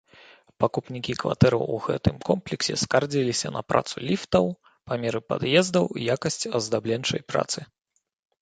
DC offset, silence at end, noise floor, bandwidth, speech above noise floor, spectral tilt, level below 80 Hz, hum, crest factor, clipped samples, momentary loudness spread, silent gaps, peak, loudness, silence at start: under 0.1%; 0.75 s; -53 dBFS; 9.4 kHz; 28 dB; -4.5 dB/octave; -50 dBFS; none; 22 dB; under 0.1%; 8 LU; none; -4 dBFS; -25 LUFS; 0.6 s